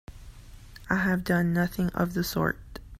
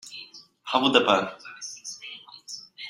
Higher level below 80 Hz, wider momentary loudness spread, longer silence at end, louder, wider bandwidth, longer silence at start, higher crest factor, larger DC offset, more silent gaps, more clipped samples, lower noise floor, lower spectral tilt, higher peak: first, -46 dBFS vs -70 dBFS; second, 5 LU vs 21 LU; about the same, 0 s vs 0 s; second, -27 LUFS vs -23 LUFS; first, 16 kHz vs 14 kHz; about the same, 0.1 s vs 0.05 s; about the same, 20 dB vs 24 dB; neither; neither; neither; about the same, -47 dBFS vs -47 dBFS; first, -6 dB/octave vs -2.5 dB/octave; second, -8 dBFS vs -4 dBFS